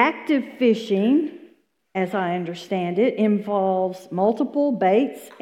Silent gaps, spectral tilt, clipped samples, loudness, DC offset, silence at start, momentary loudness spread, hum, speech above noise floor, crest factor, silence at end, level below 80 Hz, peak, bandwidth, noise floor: none; -7 dB/octave; under 0.1%; -22 LUFS; under 0.1%; 0 s; 8 LU; none; 35 dB; 20 dB; 0.15 s; -72 dBFS; -2 dBFS; 14.5 kHz; -56 dBFS